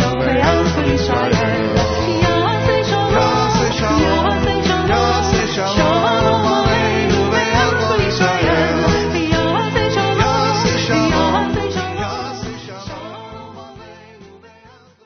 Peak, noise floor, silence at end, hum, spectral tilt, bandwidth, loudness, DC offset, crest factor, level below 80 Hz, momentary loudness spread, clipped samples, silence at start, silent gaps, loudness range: 0 dBFS; -46 dBFS; 0.7 s; none; -4 dB/octave; 6.6 kHz; -15 LUFS; under 0.1%; 16 dB; -32 dBFS; 11 LU; under 0.1%; 0 s; none; 5 LU